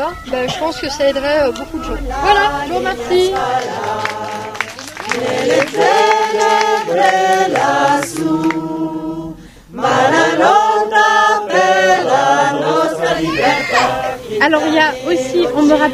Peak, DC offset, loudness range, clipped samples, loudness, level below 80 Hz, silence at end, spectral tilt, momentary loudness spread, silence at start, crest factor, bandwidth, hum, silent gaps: 0 dBFS; under 0.1%; 5 LU; under 0.1%; -14 LUFS; -38 dBFS; 0 s; -3.5 dB/octave; 11 LU; 0 s; 14 dB; 15.5 kHz; none; none